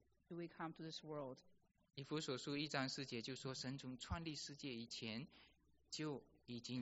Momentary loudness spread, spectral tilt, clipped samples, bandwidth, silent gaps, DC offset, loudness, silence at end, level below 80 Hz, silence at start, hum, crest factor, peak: 11 LU; -4 dB/octave; under 0.1%; 8 kHz; none; under 0.1%; -49 LUFS; 0 s; -68 dBFS; 0.3 s; none; 24 dB; -26 dBFS